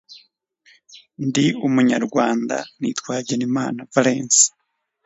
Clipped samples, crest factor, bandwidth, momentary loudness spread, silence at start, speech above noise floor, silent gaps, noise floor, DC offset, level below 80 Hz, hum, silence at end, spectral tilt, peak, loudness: under 0.1%; 20 dB; 8 kHz; 12 LU; 0.1 s; 38 dB; none; -58 dBFS; under 0.1%; -68 dBFS; none; 0.55 s; -3.5 dB/octave; 0 dBFS; -19 LUFS